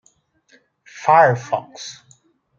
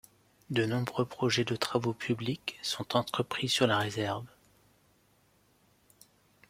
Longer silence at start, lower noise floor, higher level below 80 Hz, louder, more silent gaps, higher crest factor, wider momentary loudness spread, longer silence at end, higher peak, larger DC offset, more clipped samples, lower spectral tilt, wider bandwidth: first, 0.95 s vs 0.5 s; second, -59 dBFS vs -68 dBFS; about the same, -72 dBFS vs -68 dBFS; first, -17 LUFS vs -31 LUFS; neither; about the same, 20 dB vs 24 dB; first, 21 LU vs 8 LU; second, 0.65 s vs 2.2 s; first, -2 dBFS vs -10 dBFS; neither; neither; about the same, -5 dB/octave vs -4.5 dB/octave; second, 7.6 kHz vs 16.5 kHz